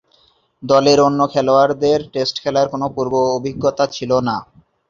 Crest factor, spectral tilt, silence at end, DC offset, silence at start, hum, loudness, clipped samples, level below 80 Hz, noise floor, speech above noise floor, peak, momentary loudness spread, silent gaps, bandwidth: 16 dB; -5.5 dB/octave; 0.45 s; under 0.1%; 0.6 s; none; -16 LUFS; under 0.1%; -52 dBFS; -57 dBFS; 41 dB; -2 dBFS; 8 LU; none; 7.4 kHz